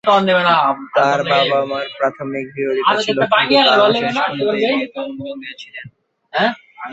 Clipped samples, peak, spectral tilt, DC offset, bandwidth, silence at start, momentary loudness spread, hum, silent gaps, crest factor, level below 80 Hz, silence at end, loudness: under 0.1%; 0 dBFS; -4.5 dB/octave; under 0.1%; 8 kHz; 0.05 s; 17 LU; none; none; 16 dB; -62 dBFS; 0 s; -16 LUFS